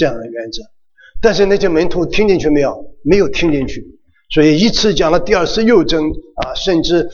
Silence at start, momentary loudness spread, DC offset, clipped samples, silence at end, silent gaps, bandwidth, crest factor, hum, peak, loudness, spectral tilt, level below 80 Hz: 0 s; 13 LU; under 0.1%; under 0.1%; 0 s; none; 7.2 kHz; 12 dB; none; 0 dBFS; -14 LUFS; -5 dB/octave; -30 dBFS